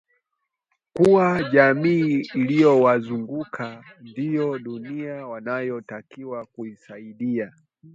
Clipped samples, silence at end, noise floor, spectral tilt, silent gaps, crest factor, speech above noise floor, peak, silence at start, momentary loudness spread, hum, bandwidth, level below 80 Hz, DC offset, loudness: under 0.1%; 0.45 s; -80 dBFS; -8 dB/octave; none; 20 dB; 59 dB; -2 dBFS; 0.95 s; 20 LU; none; 10.5 kHz; -62 dBFS; under 0.1%; -21 LUFS